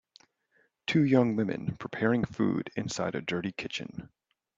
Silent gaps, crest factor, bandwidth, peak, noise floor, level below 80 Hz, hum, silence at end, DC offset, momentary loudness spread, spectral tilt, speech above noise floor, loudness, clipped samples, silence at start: none; 22 dB; 7.8 kHz; -8 dBFS; -71 dBFS; -64 dBFS; none; 0.5 s; under 0.1%; 13 LU; -6 dB/octave; 42 dB; -30 LUFS; under 0.1%; 0.9 s